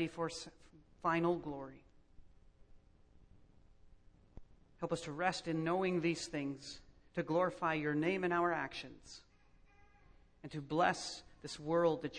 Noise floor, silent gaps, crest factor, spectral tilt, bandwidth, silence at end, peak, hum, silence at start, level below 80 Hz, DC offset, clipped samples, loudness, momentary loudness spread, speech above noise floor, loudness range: -66 dBFS; none; 22 dB; -5.5 dB/octave; 10 kHz; 0 s; -18 dBFS; none; 0 s; -66 dBFS; under 0.1%; under 0.1%; -38 LUFS; 17 LU; 28 dB; 8 LU